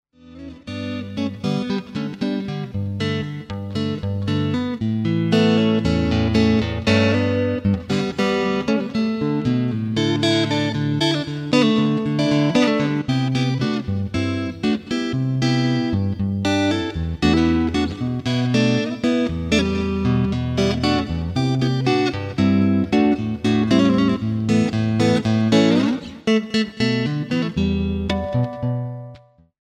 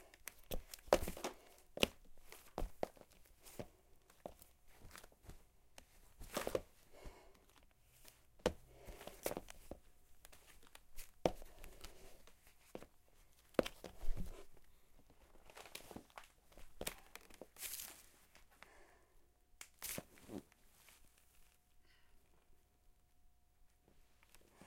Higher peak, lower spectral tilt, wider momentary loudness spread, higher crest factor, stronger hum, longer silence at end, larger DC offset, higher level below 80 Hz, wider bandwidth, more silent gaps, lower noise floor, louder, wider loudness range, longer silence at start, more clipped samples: first, -4 dBFS vs -12 dBFS; first, -6.5 dB/octave vs -3.5 dB/octave; second, 8 LU vs 24 LU; second, 16 dB vs 36 dB; neither; first, 0.45 s vs 0 s; neither; first, -40 dBFS vs -56 dBFS; second, 11.5 kHz vs 16.5 kHz; neither; second, -45 dBFS vs -71 dBFS; first, -20 LUFS vs -46 LUFS; second, 5 LU vs 8 LU; first, 0.25 s vs 0 s; neither